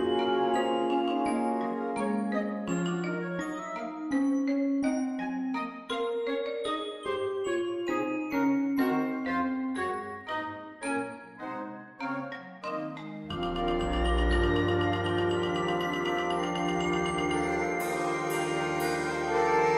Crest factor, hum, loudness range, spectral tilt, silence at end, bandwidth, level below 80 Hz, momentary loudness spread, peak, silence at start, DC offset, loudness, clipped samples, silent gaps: 16 dB; none; 6 LU; -5.5 dB/octave; 0 s; 15.5 kHz; -44 dBFS; 9 LU; -14 dBFS; 0 s; under 0.1%; -30 LUFS; under 0.1%; none